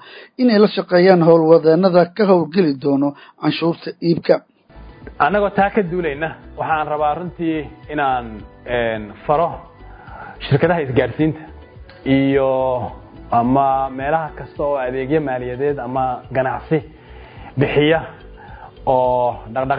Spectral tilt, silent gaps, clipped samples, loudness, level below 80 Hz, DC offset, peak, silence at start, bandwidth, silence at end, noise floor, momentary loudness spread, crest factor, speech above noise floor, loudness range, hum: -10.5 dB/octave; none; under 0.1%; -17 LUFS; -42 dBFS; under 0.1%; 0 dBFS; 0.05 s; 5.2 kHz; 0 s; -41 dBFS; 13 LU; 18 dB; 24 dB; 7 LU; none